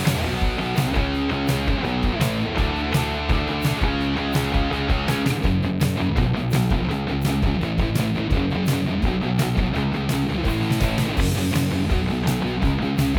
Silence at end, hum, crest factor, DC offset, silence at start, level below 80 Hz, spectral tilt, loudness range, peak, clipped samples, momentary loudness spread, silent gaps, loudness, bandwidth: 0 s; none; 14 dB; under 0.1%; 0 s; -28 dBFS; -6 dB/octave; 1 LU; -6 dBFS; under 0.1%; 2 LU; none; -22 LUFS; over 20 kHz